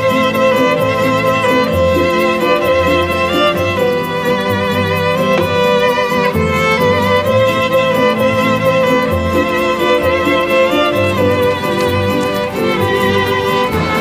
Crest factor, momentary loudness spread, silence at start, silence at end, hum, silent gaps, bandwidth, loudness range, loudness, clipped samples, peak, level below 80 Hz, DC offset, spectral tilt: 12 dB; 3 LU; 0 s; 0 s; none; none; 16 kHz; 1 LU; -13 LUFS; under 0.1%; 0 dBFS; -38 dBFS; under 0.1%; -5.5 dB/octave